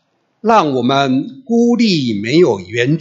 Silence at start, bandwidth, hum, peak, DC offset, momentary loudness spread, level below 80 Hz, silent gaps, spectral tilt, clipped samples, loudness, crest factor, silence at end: 0.45 s; 7.8 kHz; none; 0 dBFS; under 0.1%; 5 LU; -60 dBFS; none; -6 dB/octave; under 0.1%; -14 LUFS; 14 dB; 0 s